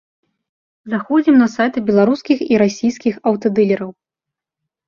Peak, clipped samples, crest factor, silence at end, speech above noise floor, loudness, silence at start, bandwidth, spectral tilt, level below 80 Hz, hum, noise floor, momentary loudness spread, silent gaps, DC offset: -2 dBFS; under 0.1%; 14 dB; 0.95 s; 70 dB; -16 LUFS; 0.85 s; 7.2 kHz; -6.5 dB/octave; -58 dBFS; none; -85 dBFS; 8 LU; none; under 0.1%